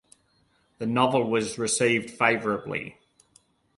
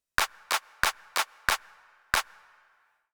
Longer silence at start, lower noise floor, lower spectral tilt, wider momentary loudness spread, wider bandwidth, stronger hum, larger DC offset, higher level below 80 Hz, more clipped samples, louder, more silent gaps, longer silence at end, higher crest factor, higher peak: first, 0.8 s vs 0.2 s; about the same, -67 dBFS vs -67 dBFS; first, -4 dB/octave vs 0.5 dB/octave; first, 11 LU vs 3 LU; second, 11.5 kHz vs over 20 kHz; neither; neither; second, -64 dBFS vs -52 dBFS; neither; first, -25 LUFS vs -29 LUFS; neither; about the same, 0.85 s vs 0.9 s; second, 22 dB vs 28 dB; about the same, -6 dBFS vs -4 dBFS